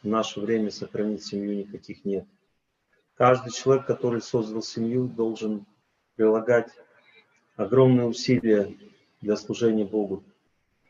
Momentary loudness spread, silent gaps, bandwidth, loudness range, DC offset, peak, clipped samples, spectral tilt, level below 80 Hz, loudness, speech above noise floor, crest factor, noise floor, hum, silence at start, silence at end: 13 LU; none; 7.6 kHz; 4 LU; under 0.1%; -6 dBFS; under 0.1%; -6.5 dB/octave; -68 dBFS; -25 LUFS; 49 dB; 20 dB; -73 dBFS; none; 0.05 s; 0.7 s